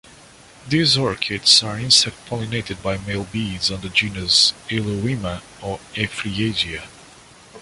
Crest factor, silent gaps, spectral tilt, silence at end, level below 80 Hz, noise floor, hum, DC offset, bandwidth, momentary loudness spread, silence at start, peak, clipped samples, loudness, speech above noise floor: 22 dB; none; -3 dB/octave; 0 s; -46 dBFS; -46 dBFS; none; under 0.1%; 11.5 kHz; 14 LU; 0.6 s; 0 dBFS; under 0.1%; -18 LUFS; 25 dB